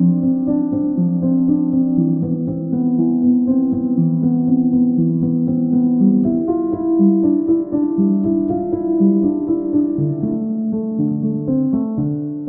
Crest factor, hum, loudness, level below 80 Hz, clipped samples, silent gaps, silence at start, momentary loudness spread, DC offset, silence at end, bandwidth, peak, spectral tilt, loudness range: 12 dB; none; -17 LUFS; -50 dBFS; under 0.1%; none; 0 s; 6 LU; under 0.1%; 0 s; 1.6 kHz; -4 dBFS; -16.5 dB/octave; 2 LU